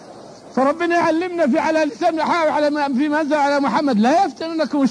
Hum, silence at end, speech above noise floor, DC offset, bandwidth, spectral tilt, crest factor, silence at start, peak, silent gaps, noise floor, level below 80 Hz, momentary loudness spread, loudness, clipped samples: none; 0 s; 22 dB; under 0.1%; 10.5 kHz; -5.5 dB/octave; 12 dB; 0 s; -6 dBFS; none; -39 dBFS; -64 dBFS; 3 LU; -18 LUFS; under 0.1%